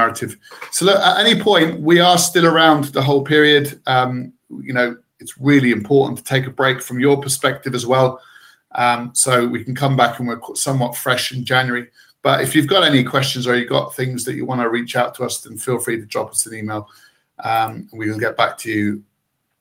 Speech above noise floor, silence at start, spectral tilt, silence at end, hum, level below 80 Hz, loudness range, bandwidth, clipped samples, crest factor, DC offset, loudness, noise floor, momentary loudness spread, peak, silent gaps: 54 dB; 0 s; -4 dB/octave; 0.6 s; none; -62 dBFS; 8 LU; 16.5 kHz; under 0.1%; 16 dB; under 0.1%; -16 LUFS; -71 dBFS; 13 LU; 0 dBFS; none